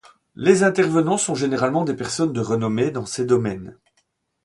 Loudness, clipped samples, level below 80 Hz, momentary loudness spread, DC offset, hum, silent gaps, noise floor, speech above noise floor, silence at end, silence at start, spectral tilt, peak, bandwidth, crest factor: -20 LUFS; under 0.1%; -56 dBFS; 8 LU; under 0.1%; none; none; -69 dBFS; 49 dB; 0.7 s; 0.4 s; -5 dB/octave; -2 dBFS; 11.5 kHz; 20 dB